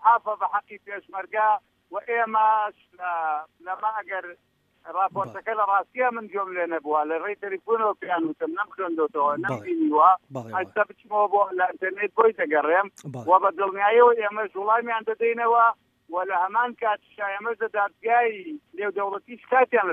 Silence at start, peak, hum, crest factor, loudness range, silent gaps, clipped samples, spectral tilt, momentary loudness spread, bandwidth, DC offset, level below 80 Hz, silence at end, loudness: 0 s; -4 dBFS; none; 20 dB; 5 LU; none; under 0.1%; -6.5 dB/octave; 12 LU; 7.6 kHz; under 0.1%; -78 dBFS; 0 s; -24 LUFS